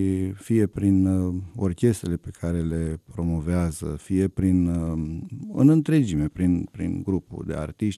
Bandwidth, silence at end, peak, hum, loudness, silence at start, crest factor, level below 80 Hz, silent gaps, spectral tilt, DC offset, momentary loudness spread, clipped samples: 13.5 kHz; 0 s; -6 dBFS; none; -24 LUFS; 0 s; 18 dB; -42 dBFS; none; -8 dB/octave; under 0.1%; 11 LU; under 0.1%